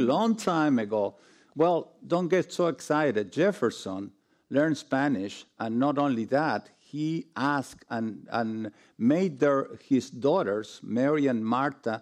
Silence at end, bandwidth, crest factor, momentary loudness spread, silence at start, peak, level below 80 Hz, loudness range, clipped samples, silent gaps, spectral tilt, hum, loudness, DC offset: 0 s; 13 kHz; 14 dB; 9 LU; 0 s; -14 dBFS; -76 dBFS; 3 LU; under 0.1%; none; -6.5 dB/octave; none; -28 LUFS; under 0.1%